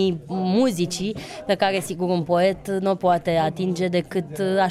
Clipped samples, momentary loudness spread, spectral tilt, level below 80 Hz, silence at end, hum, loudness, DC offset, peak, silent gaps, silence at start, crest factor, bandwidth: under 0.1%; 6 LU; -5.5 dB/octave; -54 dBFS; 0 s; none; -23 LUFS; under 0.1%; -8 dBFS; none; 0 s; 14 dB; 14.5 kHz